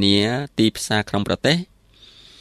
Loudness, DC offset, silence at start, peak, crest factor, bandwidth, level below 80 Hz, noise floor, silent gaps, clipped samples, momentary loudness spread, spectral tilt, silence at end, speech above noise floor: -20 LUFS; under 0.1%; 0 s; -4 dBFS; 18 dB; 14.5 kHz; -50 dBFS; -49 dBFS; none; under 0.1%; 5 LU; -4.5 dB/octave; 0.75 s; 30 dB